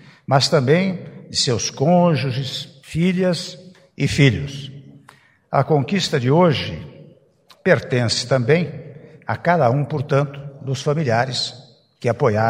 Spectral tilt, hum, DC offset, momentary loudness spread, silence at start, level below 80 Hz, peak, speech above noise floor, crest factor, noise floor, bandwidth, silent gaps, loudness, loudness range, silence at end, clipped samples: -5.5 dB/octave; none; under 0.1%; 13 LU; 0.3 s; -52 dBFS; 0 dBFS; 35 dB; 20 dB; -53 dBFS; 12 kHz; none; -19 LUFS; 2 LU; 0 s; under 0.1%